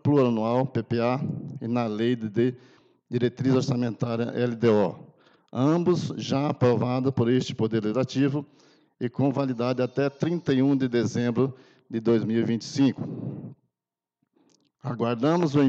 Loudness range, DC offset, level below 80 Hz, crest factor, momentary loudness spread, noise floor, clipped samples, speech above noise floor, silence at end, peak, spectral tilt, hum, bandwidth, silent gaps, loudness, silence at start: 3 LU; under 0.1%; -68 dBFS; 16 dB; 11 LU; under -90 dBFS; under 0.1%; over 66 dB; 0 s; -10 dBFS; -7.5 dB/octave; none; 7.8 kHz; none; -26 LUFS; 0.05 s